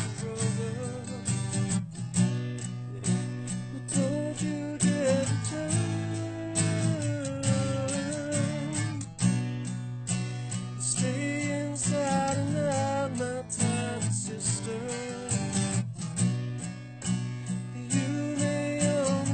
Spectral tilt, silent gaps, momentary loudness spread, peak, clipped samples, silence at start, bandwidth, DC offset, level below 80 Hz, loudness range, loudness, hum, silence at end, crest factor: -5 dB/octave; none; 7 LU; -12 dBFS; under 0.1%; 0 s; 9.2 kHz; under 0.1%; -58 dBFS; 2 LU; -30 LUFS; none; 0 s; 18 dB